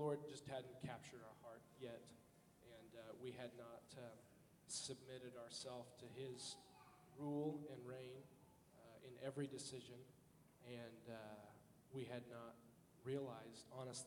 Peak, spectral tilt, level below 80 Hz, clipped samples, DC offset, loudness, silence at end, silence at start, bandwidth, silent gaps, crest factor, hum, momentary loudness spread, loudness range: -34 dBFS; -4.5 dB/octave; -84 dBFS; under 0.1%; under 0.1%; -54 LUFS; 0 s; 0 s; 19 kHz; none; 20 dB; none; 17 LU; 5 LU